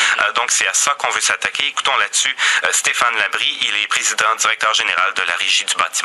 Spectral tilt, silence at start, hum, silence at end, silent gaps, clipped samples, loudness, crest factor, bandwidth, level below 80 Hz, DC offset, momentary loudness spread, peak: 2.5 dB/octave; 0 s; none; 0 s; none; under 0.1%; -15 LUFS; 18 dB; 13.5 kHz; -66 dBFS; under 0.1%; 3 LU; 0 dBFS